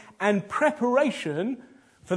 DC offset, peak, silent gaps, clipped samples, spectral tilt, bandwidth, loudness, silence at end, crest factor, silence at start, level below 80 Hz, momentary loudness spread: under 0.1%; -8 dBFS; none; under 0.1%; -5.5 dB/octave; 11 kHz; -25 LUFS; 0 s; 18 dB; 0.2 s; -70 dBFS; 8 LU